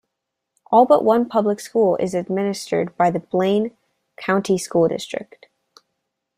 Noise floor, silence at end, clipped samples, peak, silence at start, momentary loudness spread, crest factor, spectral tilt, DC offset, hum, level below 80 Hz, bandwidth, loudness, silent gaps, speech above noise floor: -80 dBFS; 1.15 s; under 0.1%; -2 dBFS; 0.7 s; 11 LU; 18 dB; -6 dB/octave; under 0.1%; none; -64 dBFS; 15.5 kHz; -19 LUFS; none; 61 dB